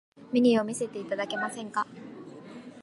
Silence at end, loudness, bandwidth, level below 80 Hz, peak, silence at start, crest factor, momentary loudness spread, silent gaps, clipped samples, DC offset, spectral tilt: 0 s; -29 LUFS; 11.5 kHz; -78 dBFS; -12 dBFS; 0.2 s; 18 dB; 22 LU; none; under 0.1%; under 0.1%; -4.5 dB/octave